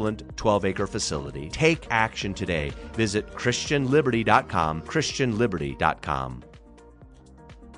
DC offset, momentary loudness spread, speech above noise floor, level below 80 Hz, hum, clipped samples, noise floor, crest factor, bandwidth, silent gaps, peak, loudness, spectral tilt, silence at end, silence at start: under 0.1%; 9 LU; 24 dB; -44 dBFS; none; under 0.1%; -49 dBFS; 22 dB; 10 kHz; none; -4 dBFS; -25 LUFS; -5 dB/octave; 0 s; 0 s